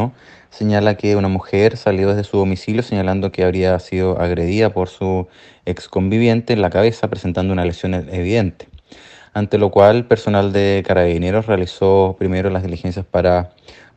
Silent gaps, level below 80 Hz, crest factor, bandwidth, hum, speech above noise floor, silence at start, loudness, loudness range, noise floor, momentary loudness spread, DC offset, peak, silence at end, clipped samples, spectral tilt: none; -42 dBFS; 16 dB; 8.4 kHz; none; 27 dB; 0 s; -17 LUFS; 3 LU; -43 dBFS; 8 LU; under 0.1%; 0 dBFS; 0.25 s; under 0.1%; -7.5 dB/octave